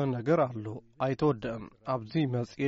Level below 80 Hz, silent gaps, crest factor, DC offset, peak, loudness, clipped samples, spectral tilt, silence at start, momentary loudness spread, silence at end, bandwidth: -62 dBFS; none; 14 dB; under 0.1%; -16 dBFS; -31 LUFS; under 0.1%; -7 dB/octave; 0 s; 12 LU; 0 s; 7.6 kHz